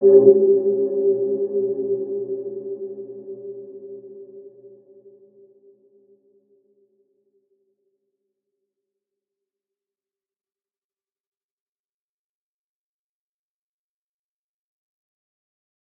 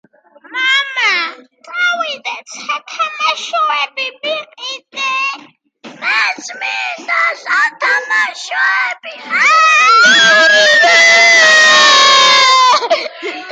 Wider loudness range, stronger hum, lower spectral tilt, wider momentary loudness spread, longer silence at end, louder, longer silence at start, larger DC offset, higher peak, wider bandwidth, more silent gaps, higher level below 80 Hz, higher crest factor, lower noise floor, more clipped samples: first, 24 LU vs 12 LU; neither; first, -14 dB/octave vs 1 dB/octave; first, 25 LU vs 17 LU; first, 11.3 s vs 0 s; second, -20 LUFS vs -9 LUFS; second, 0 s vs 0.5 s; neither; about the same, -2 dBFS vs 0 dBFS; second, 1.2 kHz vs 9.6 kHz; neither; second, under -90 dBFS vs -76 dBFS; first, 24 dB vs 12 dB; first, under -90 dBFS vs -41 dBFS; neither